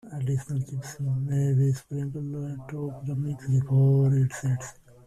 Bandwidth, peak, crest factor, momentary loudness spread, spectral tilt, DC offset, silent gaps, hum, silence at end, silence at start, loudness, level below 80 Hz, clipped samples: 11 kHz; -14 dBFS; 14 dB; 13 LU; -8 dB/octave; under 0.1%; none; none; 0.35 s; 0.05 s; -27 LUFS; -58 dBFS; under 0.1%